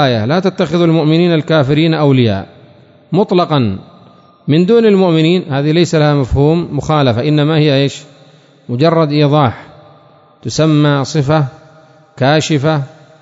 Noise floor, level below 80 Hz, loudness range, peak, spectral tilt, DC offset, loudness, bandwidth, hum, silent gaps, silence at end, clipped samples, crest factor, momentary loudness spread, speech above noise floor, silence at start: -44 dBFS; -38 dBFS; 3 LU; 0 dBFS; -7 dB/octave; under 0.1%; -12 LUFS; 7.8 kHz; none; none; 0.35 s; under 0.1%; 12 dB; 9 LU; 33 dB; 0 s